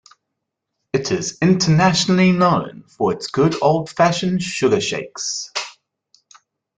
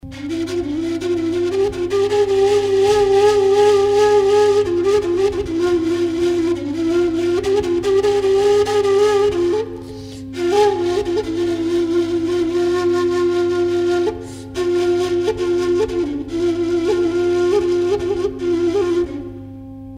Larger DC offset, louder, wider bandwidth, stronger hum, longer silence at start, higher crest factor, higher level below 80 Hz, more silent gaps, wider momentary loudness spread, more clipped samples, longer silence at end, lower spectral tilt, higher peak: neither; about the same, -18 LUFS vs -17 LUFS; second, 9.4 kHz vs 11.5 kHz; neither; first, 0.95 s vs 0.05 s; about the same, 16 dB vs 12 dB; second, -54 dBFS vs -44 dBFS; neither; about the same, 10 LU vs 9 LU; neither; first, 1.05 s vs 0 s; about the same, -5 dB/octave vs -5.5 dB/octave; about the same, -2 dBFS vs -4 dBFS